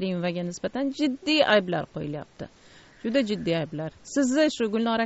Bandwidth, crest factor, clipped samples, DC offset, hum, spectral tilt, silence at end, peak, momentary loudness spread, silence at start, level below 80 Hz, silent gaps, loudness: 8 kHz; 20 dB; under 0.1%; under 0.1%; none; -3.5 dB/octave; 0 s; -6 dBFS; 14 LU; 0 s; -60 dBFS; none; -26 LUFS